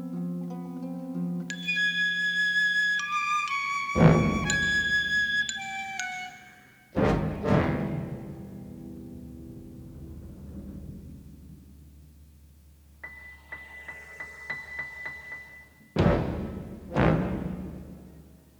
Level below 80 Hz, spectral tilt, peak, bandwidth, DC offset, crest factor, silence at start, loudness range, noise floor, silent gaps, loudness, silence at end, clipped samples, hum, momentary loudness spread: -44 dBFS; -5 dB/octave; -4 dBFS; 19.5 kHz; under 0.1%; 24 dB; 0 s; 22 LU; -54 dBFS; none; -27 LUFS; 0.25 s; under 0.1%; none; 21 LU